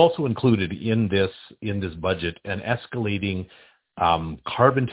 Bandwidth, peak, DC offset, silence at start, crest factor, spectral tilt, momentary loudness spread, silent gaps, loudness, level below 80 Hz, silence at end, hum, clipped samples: 4 kHz; -2 dBFS; under 0.1%; 0 s; 22 dB; -11 dB/octave; 10 LU; none; -24 LUFS; -44 dBFS; 0 s; none; under 0.1%